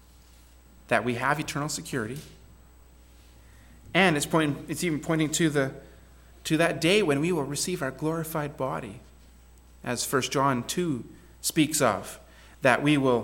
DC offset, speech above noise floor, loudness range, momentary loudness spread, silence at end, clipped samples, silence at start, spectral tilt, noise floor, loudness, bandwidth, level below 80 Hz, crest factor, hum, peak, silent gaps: under 0.1%; 27 dB; 5 LU; 13 LU; 0 s; under 0.1%; 0.9 s; -4.5 dB/octave; -53 dBFS; -26 LUFS; 17 kHz; -54 dBFS; 22 dB; none; -6 dBFS; none